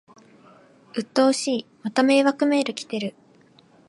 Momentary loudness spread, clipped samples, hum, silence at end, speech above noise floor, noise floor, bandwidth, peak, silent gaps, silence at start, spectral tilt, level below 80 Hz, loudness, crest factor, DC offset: 13 LU; under 0.1%; none; 0.8 s; 34 dB; -55 dBFS; 11.5 kHz; -6 dBFS; none; 0.95 s; -4 dB/octave; -78 dBFS; -22 LUFS; 18 dB; under 0.1%